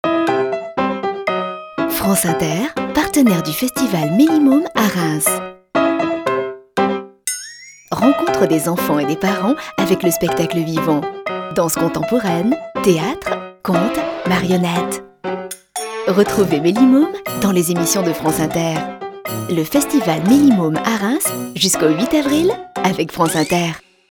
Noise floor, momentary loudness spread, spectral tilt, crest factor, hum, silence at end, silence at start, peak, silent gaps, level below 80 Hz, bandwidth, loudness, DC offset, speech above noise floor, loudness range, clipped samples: -37 dBFS; 10 LU; -4.5 dB/octave; 16 dB; none; 0.3 s; 0.05 s; 0 dBFS; none; -48 dBFS; 20 kHz; -17 LUFS; under 0.1%; 21 dB; 3 LU; under 0.1%